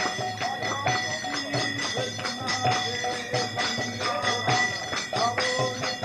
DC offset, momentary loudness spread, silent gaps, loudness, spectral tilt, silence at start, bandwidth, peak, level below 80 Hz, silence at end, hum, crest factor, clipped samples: under 0.1%; 5 LU; none; -26 LUFS; -2.5 dB/octave; 0 s; 14 kHz; -10 dBFS; -62 dBFS; 0 s; none; 16 dB; under 0.1%